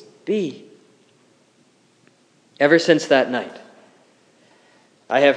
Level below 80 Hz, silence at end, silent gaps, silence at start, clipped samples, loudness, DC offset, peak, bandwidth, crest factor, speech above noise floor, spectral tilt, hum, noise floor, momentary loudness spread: -88 dBFS; 0 s; none; 0.25 s; under 0.1%; -19 LUFS; under 0.1%; 0 dBFS; 10.5 kHz; 22 dB; 41 dB; -4.5 dB/octave; none; -58 dBFS; 15 LU